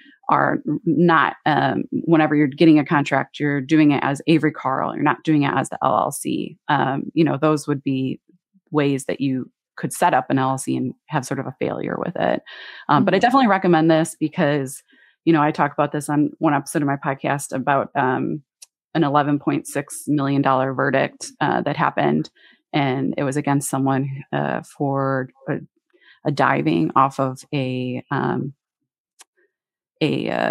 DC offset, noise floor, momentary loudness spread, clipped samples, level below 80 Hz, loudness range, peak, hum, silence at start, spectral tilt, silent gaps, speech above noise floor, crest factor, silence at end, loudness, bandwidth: under 0.1%; -82 dBFS; 10 LU; under 0.1%; -70 dBFS; 5 LU; -2 dBFS; none; 0.25 s; -6 dB/octave; 18.84-18.89 s, 29.00-29.05 s, 29.13-29.17 s, 29.27-29.33 s; 63 dB; 18 dB; 0 s; -20 LUFS; 15.5 kHz